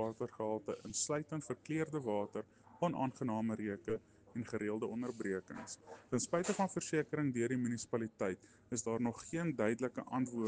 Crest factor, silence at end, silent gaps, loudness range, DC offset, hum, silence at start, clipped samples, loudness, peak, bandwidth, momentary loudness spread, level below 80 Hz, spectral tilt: 18 dB; 0 s; none; 2 LU; under 0.1%; none; 0 s; under 0.1%; -39 LUFS; -20 dBFS; 10 kHz; 8 LU; -74 dBFS; -5 dB/octave